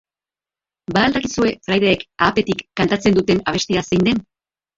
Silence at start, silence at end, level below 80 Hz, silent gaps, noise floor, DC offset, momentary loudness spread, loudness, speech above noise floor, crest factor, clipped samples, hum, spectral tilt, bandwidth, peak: 0.9 s; 0.55 s; -46 dBFS; none; under -90 dBFS; under 0.1%; 5 LU; -18 LUFS; over 73 dB; 18 dB; under 0.1%; none; -5 dB/octave; 7.8 kHz; -2 dBFS